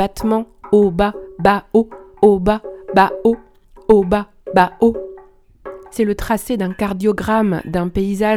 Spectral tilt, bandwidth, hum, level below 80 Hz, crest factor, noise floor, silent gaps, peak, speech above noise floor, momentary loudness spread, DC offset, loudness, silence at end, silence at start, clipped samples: -6.5 dB/octave; 15.5 kHz; none; -38 dBFS; 16 dB; -44 dBFS; none; 0 dBFS; 29 dB; 11 LU; under 0.1%; -17 LUFS; 0 s; 0 s; under 0.1%